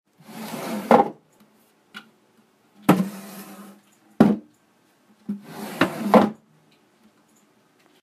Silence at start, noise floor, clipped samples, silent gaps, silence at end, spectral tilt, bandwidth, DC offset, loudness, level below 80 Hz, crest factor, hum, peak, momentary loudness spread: 0.3 s; -61 dBFS; under 0.1%; none; 1.7 s; -6.5 dB/octave; 15.5 kHz; under 0.1%; -22 LUFS; -66 dBFS; 24 dB; none; 0 dBFS; 26 LU